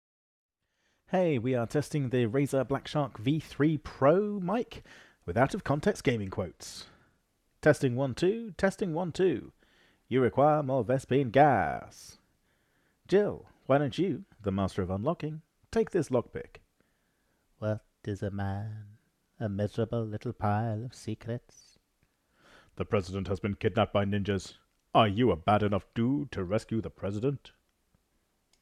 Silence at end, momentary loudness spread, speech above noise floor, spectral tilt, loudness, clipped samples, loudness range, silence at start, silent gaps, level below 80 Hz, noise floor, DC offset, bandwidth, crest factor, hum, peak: 1.15 s; 14 LU; 47 dB; -7 dB/octave; -30 LUFS; under 0.1%; 7 LU; 1.1 s; none; -58 dBFS; -76 dBFS; under 0.1%; 14 kHz; 20 dB; none; -10 dBFS